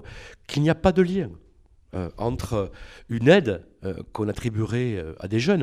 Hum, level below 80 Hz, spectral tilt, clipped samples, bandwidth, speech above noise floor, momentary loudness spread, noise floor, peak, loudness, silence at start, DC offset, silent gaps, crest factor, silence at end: none; -44 dBFS; -7 dB/octave; under 0.1%; 14 kHz; 28 dB; 16 LU; -52 dBFS; -4 dBFS; -24 LUFS; 0.05 s; under 0.1%; none; 22 dB; 0 s